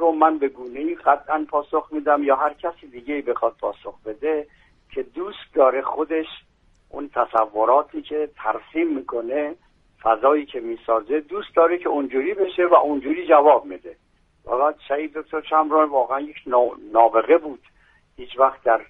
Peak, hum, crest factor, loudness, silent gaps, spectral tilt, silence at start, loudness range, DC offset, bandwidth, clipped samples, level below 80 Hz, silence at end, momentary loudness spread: 0 dBFS; none; 20 dB; -21 LUFS; none; -7 dB/octave; 0 s; 5 LU; under 0.1%; 4 kHz; under 0.1%; -60 dBFS; 0.05 s; 14 LU